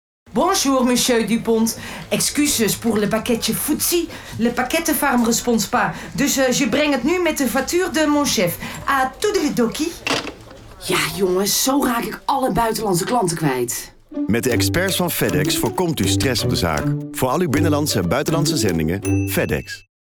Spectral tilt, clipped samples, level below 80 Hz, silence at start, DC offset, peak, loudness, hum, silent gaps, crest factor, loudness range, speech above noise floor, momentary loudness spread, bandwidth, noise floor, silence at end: -4 dB/octave; under 0.1%; -42 dBFS; 0.3 s; under 0.1%; -8 dBFS; -19 LUFS; none; none; 12 dB; 2 LU; 21 dB; 6 LU; 20 kHz; -40 dBFS; 0.25 s